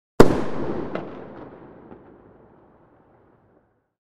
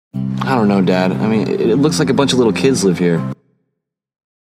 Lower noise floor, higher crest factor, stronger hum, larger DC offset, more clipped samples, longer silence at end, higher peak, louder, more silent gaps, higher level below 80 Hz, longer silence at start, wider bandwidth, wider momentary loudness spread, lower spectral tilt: second, -63 dBFS vs -75 dBFS; first, 24 dB vs 16 dB; neither; neither; neither; first, 2.55 s vs 1.05 s; about the same, 0 dBFS vs 0 dBFS; second, -22 LUFS vs -15 LUFS; neither; first, -40 dBFS vs -50 dBFS; about the same, 0.2 s vs 0.15 s; about the same, 15.5 kHz vs 15 kHz; first, 28 LU vs 7 LU; about the same, -6.5 dB/octave vs -6 dB/octave